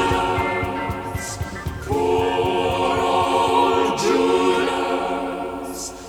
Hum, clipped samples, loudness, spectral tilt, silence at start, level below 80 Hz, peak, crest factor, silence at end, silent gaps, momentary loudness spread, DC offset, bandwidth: none; under 0.1%; -21 LUFS; -4.5 dB/octave; 0 s; -40 dBFS; -6 dBFS; 16 dB; 0 s; none; 11 LU; under 0.1%; 19 kHz